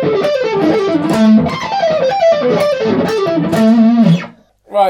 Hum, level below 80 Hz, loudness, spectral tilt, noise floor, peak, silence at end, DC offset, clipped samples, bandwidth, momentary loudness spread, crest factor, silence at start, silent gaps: none; -48 dBFS; -12 LUFS; -7 dB/octave; -35 dBFS; 0 dBFS; 0 s; under 0.1%; under 0.1%; 13.5 kHz; 6 LU; 10 dB; 0 s; none